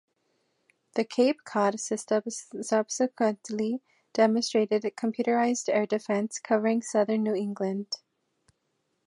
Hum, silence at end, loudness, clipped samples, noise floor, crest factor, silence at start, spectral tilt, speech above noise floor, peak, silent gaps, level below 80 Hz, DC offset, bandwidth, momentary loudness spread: none; 1.1 s; -28 LUFS; under 0.1%; -77 dBFS; 18 dB; 0.95 s; -4.5 dB/octave; 50 dB; -10 dBFS; none; -82 dBFS; under 0.1%; 11.5 kHz; 8 LU